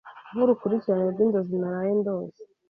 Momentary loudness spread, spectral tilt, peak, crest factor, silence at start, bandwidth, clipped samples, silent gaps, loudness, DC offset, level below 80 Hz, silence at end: 10 LU; -11 dB/octave; -10 dBFS; 16 dB; 0.05 s; 5 kHz; under 0.1%; none; -25 LUFS; under 0.1%; -70 dBFS; 0.25 s